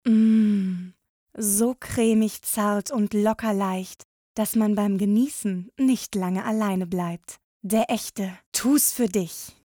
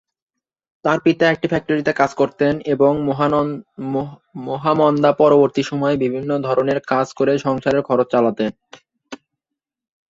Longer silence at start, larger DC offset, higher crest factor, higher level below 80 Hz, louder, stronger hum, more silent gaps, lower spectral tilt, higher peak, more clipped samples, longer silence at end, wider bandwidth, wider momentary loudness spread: second, 0.05 s vs 0.85 s; neither; about the same, 12 dB vs 16 dB; about the same, -58 dBFS vs -56 dBFS; second, -24 LUFS vs -18 LUFS; neither; first, 1.09-1.27 s, 4.05-4.35 s, 7.44-7.60 s, 8.46-8.52 s vs none; second, -5 dB/octave vs -7 dB/octave; second, -10 dBFS vs -2 dBFS; neither; second, 0.15 s vs 0.95 s; first, over 20 kHz vs 7.8 kHz; about the same, 12 LU vs 10 LU